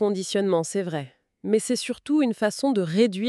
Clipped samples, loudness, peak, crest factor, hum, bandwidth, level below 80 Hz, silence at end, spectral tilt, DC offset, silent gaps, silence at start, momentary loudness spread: under 0.1%; -24 LUFS; -8 dBFS; 16 dB; none; 13 kHz; -70 dBFS; 0 s; -5 dB/octave; under 0.1%; none; 0 s; 10 LU